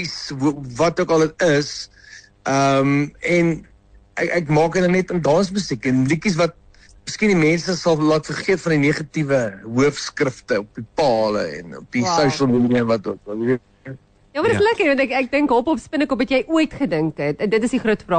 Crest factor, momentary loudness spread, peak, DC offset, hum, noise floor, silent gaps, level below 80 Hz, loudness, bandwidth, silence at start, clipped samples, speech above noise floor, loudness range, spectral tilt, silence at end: 14 dB; 9 LU; -6 dBFS; under 0.1%; none; -38 dBFS; none; -50 dBFS; -19 LUFS; 9.4 kHz; 0 s; under 0.1%; 19 dB; 2 LU; -5.5 dB/octave; 0 s